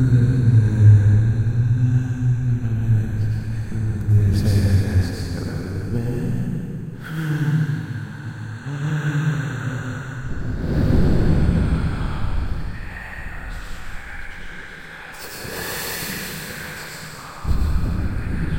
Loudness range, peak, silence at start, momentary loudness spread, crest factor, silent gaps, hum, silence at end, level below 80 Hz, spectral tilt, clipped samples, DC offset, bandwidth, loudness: 12 LU; -2 dBFS; 0 s; 17 LU; 18 dB; none; none; 0 s; -30 dBFS; -7 dB/octave; under 0.1%; under 0.1%; 16.5 kHz; -21 LUFS